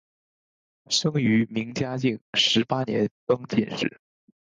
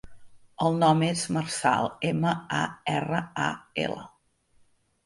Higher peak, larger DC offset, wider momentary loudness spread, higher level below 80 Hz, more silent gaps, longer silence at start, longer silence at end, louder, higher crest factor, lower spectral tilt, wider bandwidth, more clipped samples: about the same, -8 dBFS vs -8 dBFS; neither; about the same, 8 LU vs 9 LU; about the same, -62 dBFS vs -62 dBFS; first, 2.21-2.33 s, 3.11-3.27 s vs none; first, 0.9 s vs 0.05 s; second, 0.5 s vs 1 s; first, -24 LUFS vs -27 LUFS; about the same, 18 dB vs 20 dB; about the same, -4.5 dB/octave vs -5 dB/octave; second, 9.6 kHz vs 11.5 kHz; neither